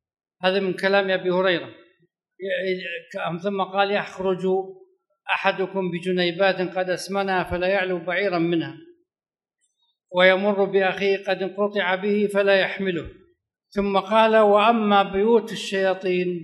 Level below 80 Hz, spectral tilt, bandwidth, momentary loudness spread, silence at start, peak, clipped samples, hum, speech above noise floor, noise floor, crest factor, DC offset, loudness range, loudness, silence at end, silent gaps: -56 dBFS; -5.5 dB/octave; 12 kHz; 10 LU; 0.4 s; -2 dBFS; under 0.1%; none; over 68 dB; under -90 dBFS; 20 dB; under 0.1%; 6 LU; -22 LUFS; 0 s; none